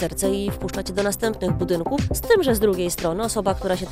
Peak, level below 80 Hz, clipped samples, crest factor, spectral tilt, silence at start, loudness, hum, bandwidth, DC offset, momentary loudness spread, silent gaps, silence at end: -4 dBFS; -36 dBFS; under 0.1%; 18 dB; -5 dB/octave; 0 s; -22 LUFS; none; 16 kHz; under 0.1%; 6 LU; none; 0 s